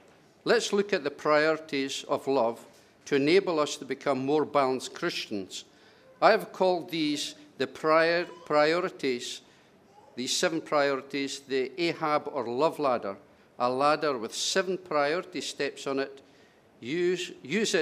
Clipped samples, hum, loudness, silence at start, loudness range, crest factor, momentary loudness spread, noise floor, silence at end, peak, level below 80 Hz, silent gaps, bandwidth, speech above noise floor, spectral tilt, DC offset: under 0.1%; none; -28 LUFS; 0.45 s; 3 LU; 22 dB; 11 LU; -59 dBFS; 0 s; -8 dBFS; -80 dBFS; none; 15.5 kHz; 31 dB; -3.5 dB/octave; under 0.1%